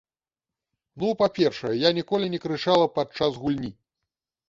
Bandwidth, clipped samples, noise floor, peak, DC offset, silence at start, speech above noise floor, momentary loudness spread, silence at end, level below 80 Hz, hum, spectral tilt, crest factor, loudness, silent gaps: 7.6 kHz; under 0.1%; under -90 dBFS; -6 dBFS; under 0.1%; 0.95 s; over 66 dB; 7 LU; 0.75 s; -60 dBFS; none; -6 dB/octave; 20 dB; -24 LUFS; none